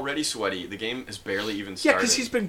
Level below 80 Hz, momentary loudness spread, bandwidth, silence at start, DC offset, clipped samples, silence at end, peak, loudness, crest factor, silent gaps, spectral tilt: -56 dBFS; 10 LU; 17 kHz; 0 s; under 0.1%; under 0.1%; 0 s; -6 dBFS; -26 LUFS; 22 dB; none; -2.5 dB/octave